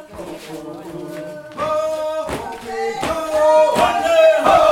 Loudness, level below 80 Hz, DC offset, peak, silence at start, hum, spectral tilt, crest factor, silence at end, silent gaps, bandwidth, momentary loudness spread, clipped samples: -16 LUFS; -46 dBFS; under 0.1%; -2 dBFS; 0 s; none; -4 dB/octave; 14 dB; 0 s; none; 16 kHz; 19 LU; under 0.1%